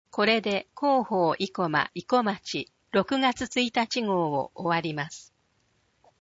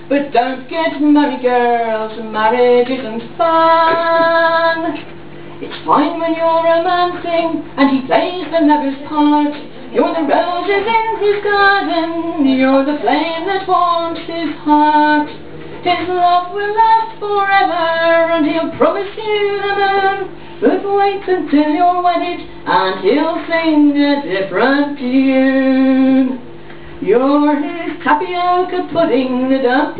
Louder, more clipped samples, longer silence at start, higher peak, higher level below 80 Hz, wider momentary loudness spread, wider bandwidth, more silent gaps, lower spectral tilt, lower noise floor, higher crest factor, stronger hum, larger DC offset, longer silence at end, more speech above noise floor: second, -27 LUFS vs -14 LUFS; neither; first, 0.15 s vs 0 s; second, -8 dBFS vs 0 dBFS; second, -64 dBFS vs -52 dBFS; about the same, 9 LU vs 9 LU; first, 8 kHz vs 4 kHz; neither; second, -4.5 dB/octave vs -8.5 dB/octave; first, -70 dBFS vs -34 dBFS; first, 20 dB vs 14 dB; second, none vs 50 Hz at -45 dBFS; second, under 0.1% vs 2%; first, 1 s vs 0 s; first, 43 dB vs 20 dB